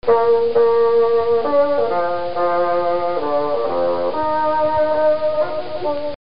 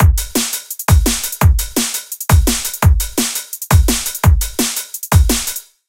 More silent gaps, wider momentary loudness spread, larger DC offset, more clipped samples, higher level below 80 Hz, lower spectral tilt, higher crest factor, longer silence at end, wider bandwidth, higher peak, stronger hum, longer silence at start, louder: neither; about the same, 7 LU vs 6 LU; first, 4% vs under 0.1%; neither; second, -52 dBFS vs -18 dBFS; about the same, -3.5 dB/octave vs -4 dB/octave; about the same, 12 dB vs 14 dB; second, 0.05 s vs 0.3 s; second, 5.4 kHz vs 17.5 kHz; second, -4 dBFS vs 0 dBFS; neither; about the same, 0 s vs 0 s; second, -18 LUFS vs -15 LUFS